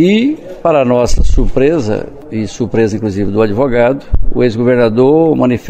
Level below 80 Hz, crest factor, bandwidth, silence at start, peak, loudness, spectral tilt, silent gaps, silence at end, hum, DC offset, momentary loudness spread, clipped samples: -18 dBFS; 10 dB; 9 kHz; 0 s; 0 dBFS; -12 LUFS; -7 dB/octave; none; 0 s; none; under 0.1%; 9 LU; under 0.1%